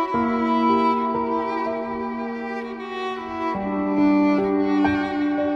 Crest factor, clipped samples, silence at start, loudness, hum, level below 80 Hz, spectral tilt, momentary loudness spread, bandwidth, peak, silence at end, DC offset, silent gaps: 14 dB; under 0.1%; 0 s; -22 LUFS; none; -54 dBFS; -7.5 dB/octave; 10 LU; 6.6 kHz; -8 dBFS; 0 s; under 0.1%; none